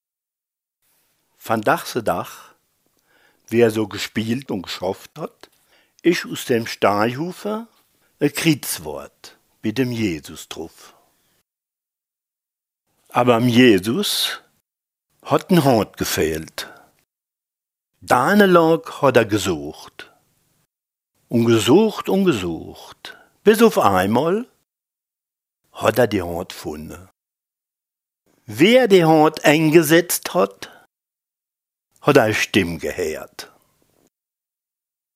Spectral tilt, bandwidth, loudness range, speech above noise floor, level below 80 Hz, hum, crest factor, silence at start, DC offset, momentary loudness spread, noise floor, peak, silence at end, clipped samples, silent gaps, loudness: -5 dB/octave; 16 kHz; 9 LU; 71 dB; -54 dBFS; none; 20 dB; 1.45 s; under 0.1%; 21 LU; -89 dBFS; 0 dBFS; 1.7 s; under 0.1%; none; -18 LUFS